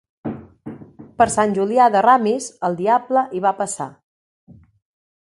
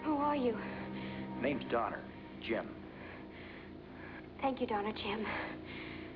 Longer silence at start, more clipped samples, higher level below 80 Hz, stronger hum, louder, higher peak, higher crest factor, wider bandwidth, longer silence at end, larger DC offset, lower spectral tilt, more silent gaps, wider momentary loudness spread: first, 0.25 s vs 0 s; neither; first, -56 dBFS vs -62 dBFS; neither; first, -18 LUFS vs -39 LUFS; first, 0 dBFS vs -22 dBFS; about the same, 20 dB vs 16 dB; first, 11.5 kHz vs 5.4 kHz; first, 1.4 s vs 0 s; neither; about the same, -5 dB/octave vs -4 dB/octave; neither; first, 21 LU vs 14 LU